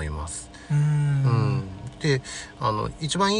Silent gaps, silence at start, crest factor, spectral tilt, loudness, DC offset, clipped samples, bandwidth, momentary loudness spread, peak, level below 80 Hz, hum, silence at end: none; 0 s; 14 dB; -5.5 dB/octave; -25 LUFS; under 0.1%; under 0.1%; 10.5 kHz; 12 LU; -10 dBFS; -42 dBFS; none; 0 s